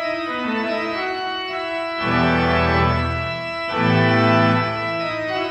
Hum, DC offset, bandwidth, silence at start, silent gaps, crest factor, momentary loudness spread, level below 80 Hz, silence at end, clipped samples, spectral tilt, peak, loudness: none; under 0.1%; 8.4 kHz; 0 s; none; 16 dB; 9 LU; -42 dBFS; 0 s; under 0.1%; -7 dB/octave; -4 dBFS; -20 LUFS